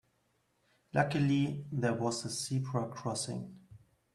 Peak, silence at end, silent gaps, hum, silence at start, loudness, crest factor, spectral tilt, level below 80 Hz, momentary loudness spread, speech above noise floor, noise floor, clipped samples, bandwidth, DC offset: -14 dBFS; 0.4 s; none; none; 0.95 s; -34 LUFS; 20 dB; -5.5 dB/octave; -70 dBFS; 8 LU; 42 dB; -76 dBFS; under 0.1%; 12.5 kHz; under 0.1%